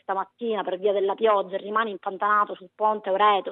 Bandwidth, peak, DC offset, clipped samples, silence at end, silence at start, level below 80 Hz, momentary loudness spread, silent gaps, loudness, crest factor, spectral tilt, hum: 4.1 kHz; -8 dBFS; under 0.1%; under 0.1%; 0 s; 0.1 s; -90 dBFS; 8 LU; none; -24 LUFS; 16 dB; -7.5 dB/octave; none